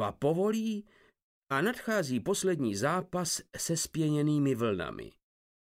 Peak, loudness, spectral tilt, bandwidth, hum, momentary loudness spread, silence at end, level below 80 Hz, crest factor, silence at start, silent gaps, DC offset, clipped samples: -16 dBFS; -31 LUFS; -5 dB/octave; 16 kHz; none; 7 LU; 0.65 s; -64 dBFS; 16 dB; 0 s; 1.22-1.42 s; under 0.1%; under 0.1%